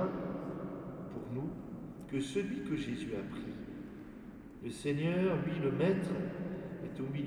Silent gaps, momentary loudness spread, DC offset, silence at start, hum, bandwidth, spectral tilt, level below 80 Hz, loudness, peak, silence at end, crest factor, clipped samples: none; 15 LU; under 0.1%; 0 s; none; 12 kHz; -7 dB/octave; -60 dBFS; -38 LUFS; -18 dBFS; 0 s; 18 dB; under 0.1%